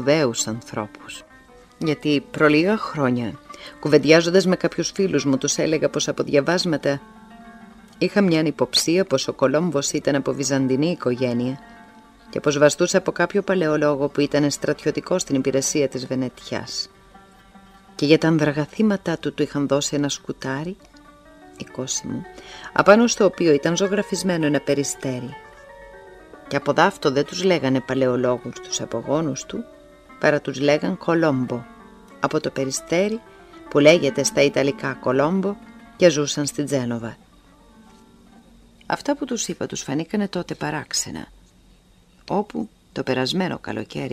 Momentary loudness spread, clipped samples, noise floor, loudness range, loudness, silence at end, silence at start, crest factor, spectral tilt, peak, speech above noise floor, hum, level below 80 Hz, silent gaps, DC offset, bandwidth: 13 LU; under 0.1%; -54 dBFS; 7 LU; -21 LUFS; 0 s; 0 s; 22 dB; -4.5 dB/octave; 0 dBFS; 33 dB; none; -56 dBFS; none; under 0.1%; 15.5 kHz